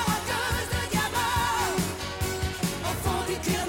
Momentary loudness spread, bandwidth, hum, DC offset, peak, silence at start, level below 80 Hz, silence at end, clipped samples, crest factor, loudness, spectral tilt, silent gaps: 4 LU; 17 kHz; none; under 0.1%; -12 dBFS; 0 s; -40 dBFS; 0 s; under 0.1%; 14 dB; -27 LUFS; -3.5 dB/octave; none